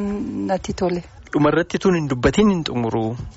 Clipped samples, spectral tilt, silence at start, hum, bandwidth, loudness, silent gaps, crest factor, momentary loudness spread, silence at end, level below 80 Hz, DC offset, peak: under 0.1%; -6 dB/octave; 0 s; none; 8 kHz; -20 LUFS; none; 16 dB; 8 LU; 0.05 s; -40 dBFS; under 0.1%; -4 dBFS